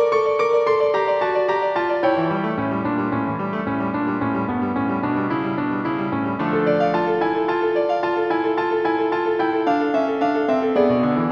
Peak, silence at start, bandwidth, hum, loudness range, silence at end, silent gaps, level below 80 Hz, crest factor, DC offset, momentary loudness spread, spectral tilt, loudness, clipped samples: -6 dBFS; 0 s; 7.4 kHz; none; 3 LU; 0 s; none; -56 dBFS; 14 dB; under 0.1%; 5 LU; -8 dB/octave; -21 LUFS; under 0.1%